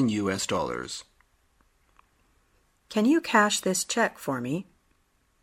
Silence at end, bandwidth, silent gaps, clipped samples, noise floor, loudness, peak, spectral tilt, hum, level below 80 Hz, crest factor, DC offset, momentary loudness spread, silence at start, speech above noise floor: 0.8 s; 16 kHz; none; under 0.1%; -68 dBFS; -26 LUFS; -6 dBFS; -3.5 dB/octave; none; -62 dBFS; 22 dB; under 0.1%; 13 LU; 0 s; 42 dB